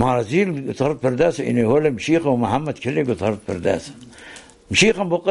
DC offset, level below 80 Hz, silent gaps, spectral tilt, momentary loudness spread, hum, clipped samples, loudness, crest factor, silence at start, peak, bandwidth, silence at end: under 0.1%; -46 dBFS; none; -5 dB/octave; 12 LU; none; under 0.1%; -20 LUFS; 16 dB; 0 s; -2 dBFS; 11.5 kHz; 0 s